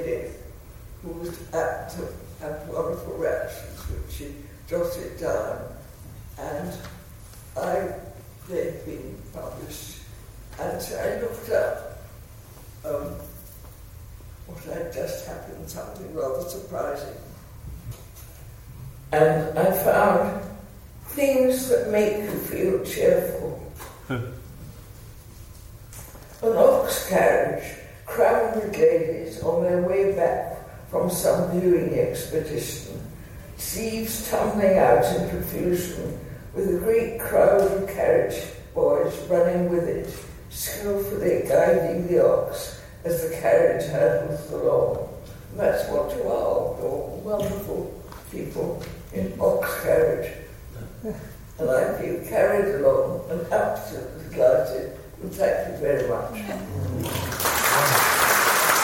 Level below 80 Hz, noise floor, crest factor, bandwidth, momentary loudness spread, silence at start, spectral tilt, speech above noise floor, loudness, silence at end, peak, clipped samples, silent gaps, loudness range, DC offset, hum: -46 dBFS; -44 dBFS; 20 dB; 17 kHz; 22 LU; 0 s; -4.5 dB/octave; 20 dB; -24 LUFS; 0 s; -4 dBFS; under 0.1%; none; 11 LU; under 0.1%; none